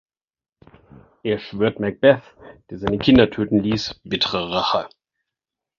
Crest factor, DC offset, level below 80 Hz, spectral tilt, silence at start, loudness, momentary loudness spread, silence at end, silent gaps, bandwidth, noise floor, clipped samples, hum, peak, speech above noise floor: 20 dB; under 0.1%; -46 dBFS; -6 dB/octave; 1.25 s; -20 LUFS; 11 LU; 0.9 s; none; 7.2 kHz; under -90 dBFS; under 0.1%; none; -2 dBFS; over 71 dB